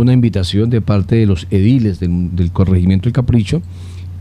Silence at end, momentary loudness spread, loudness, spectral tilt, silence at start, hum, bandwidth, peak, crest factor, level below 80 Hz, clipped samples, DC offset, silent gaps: 0 s; 7 LU; -14 LUFS; -8.5 dB/octave; 0 s; none; 10.5 kHz; 0 dBFS; 12 dB; -32 dBFS; under 0.1%; under 0.1%; none